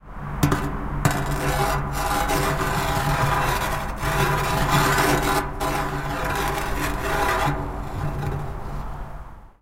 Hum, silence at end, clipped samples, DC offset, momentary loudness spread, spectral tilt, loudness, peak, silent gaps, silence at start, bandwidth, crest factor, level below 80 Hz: none; 0.1 s; under 0.1%; under 0.1%; 11 LU; -4.5 dB/octave; -23 LUFS; -4 dBFS; none; 0.05 s; 16.5 kHz; 20 dB; -32 dBFS